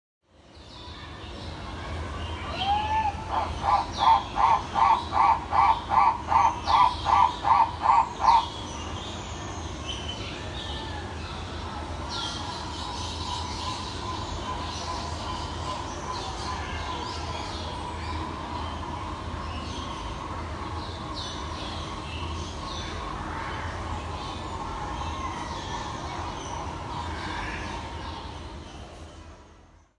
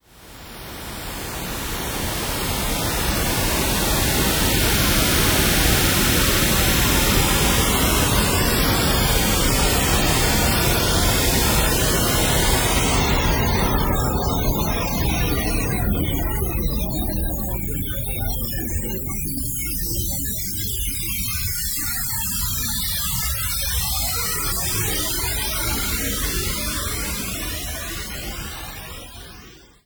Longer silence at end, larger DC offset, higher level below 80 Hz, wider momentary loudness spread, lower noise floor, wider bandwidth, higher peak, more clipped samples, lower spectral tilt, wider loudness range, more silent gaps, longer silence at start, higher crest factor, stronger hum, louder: about the same, 0.35 s vs 0.3 s; neither; second, -42 dBFS vs -28 dBFS; first, 14 LU vs 10 LU; first, -54 dBFS vs -44 dBFS; second, 11.5 kHz vs over 20 kHz; second, -8 dBFS vs -4 dBFS; neither; about the same, -4 dB/octave vs -3 dB/octave; first, 12 LU vs 7 LU; neither; first, 0.5 s vs 0.15 s; about the same, 20 dB vs 16 dB; neither; second, -28 LUFS vs -20 LUFS